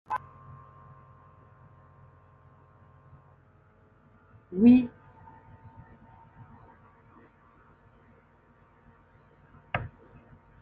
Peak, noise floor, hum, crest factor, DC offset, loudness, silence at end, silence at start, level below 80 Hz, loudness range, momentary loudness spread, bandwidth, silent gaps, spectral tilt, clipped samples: -8 dBFS; -61 dBFS; none; 24 dB; under 0.1%; -25 LUFS; 0.75 s; 0.1 s; -62 dBFS; 16 LU; 33 LU; 4.3 kHz; none; -7 dB/octave; under 0.1%